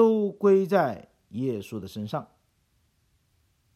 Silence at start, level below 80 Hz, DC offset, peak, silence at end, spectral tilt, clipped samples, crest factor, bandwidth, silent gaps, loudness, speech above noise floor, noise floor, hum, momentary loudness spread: 0 s; -70 dBFS; under 0.1%; -10 dBFS; 1.5 s; -8 dB/octave; under 0.1%; 18 dB; 13.5 kHz; none; -26 LUFS; 43 dB; -69 dBFS; none; 15 LU